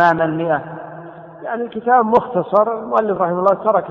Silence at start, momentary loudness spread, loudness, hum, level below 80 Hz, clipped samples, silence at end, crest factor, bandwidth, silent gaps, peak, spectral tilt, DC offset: 0 s; 18 LU; -17 LUFS; none; -56 dBFS; under 0.1%; 0 s; 16 dB; 6.8 kHz; none; -2 dBFS; -8.5 dB/octave; under 0.1%